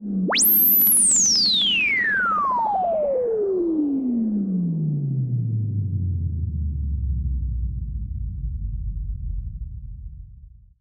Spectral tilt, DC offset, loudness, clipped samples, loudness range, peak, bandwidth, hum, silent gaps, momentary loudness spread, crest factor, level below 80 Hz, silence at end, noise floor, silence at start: -3 dB/octave; under 0.1%; -19 LUFS; under 0.1%; 14 LU; -6 dBFS; over 20 kHz; none; none; 18 LU; 16 dB; -32 dBFS; 0.25 s; -45 dBFS; 0 s